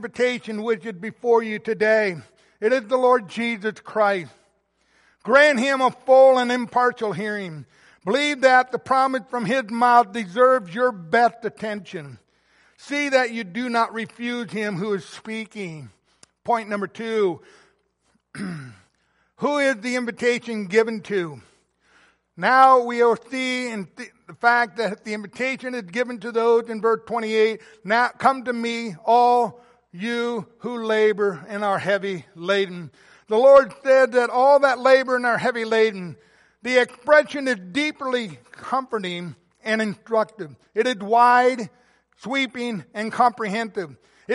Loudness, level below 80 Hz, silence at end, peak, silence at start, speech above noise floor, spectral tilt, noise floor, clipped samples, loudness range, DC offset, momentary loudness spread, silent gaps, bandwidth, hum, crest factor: -21 LUFS; -70 dBFS; 0 s; -2 dBFS; 0 s; 47 dB; -4.5 dB/octave; -68 dBFS; under 0.1%; 8 LU; under 0.1%; 17 LU; none; 11.5 kHz; none; 18 dB